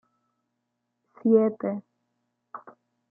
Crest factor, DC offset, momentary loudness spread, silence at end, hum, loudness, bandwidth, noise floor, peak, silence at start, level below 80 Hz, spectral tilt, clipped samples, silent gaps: 20 dB; under 0.1%; 24 LU; 0.55 s; none; -24 LUFS; 2.5 kHz; -80 dBFS; -8 dBFS; 1.25 s; -80 dBFS; -12.5 dB/octave; under 0.1%; none